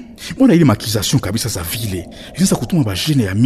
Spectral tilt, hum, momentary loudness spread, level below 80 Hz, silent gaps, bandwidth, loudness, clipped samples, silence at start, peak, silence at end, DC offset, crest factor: -5 dB/octave; none; 12 LU; -40 dBFS; none; 14 kHz; -16 LUFS; under 0.1%; 0 s; -2 dBFS; 0 s; under 0.1%; 14 dB